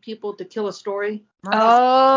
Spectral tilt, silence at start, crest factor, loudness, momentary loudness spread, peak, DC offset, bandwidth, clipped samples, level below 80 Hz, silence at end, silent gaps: -4.5 dB/octave; 0.05 s; 16 dB; -19 LUFS; 17 LU; -4 dBFS; under 0.1%; 7.6 kHz; under 0.1%; -72 dBFS; 0 s; none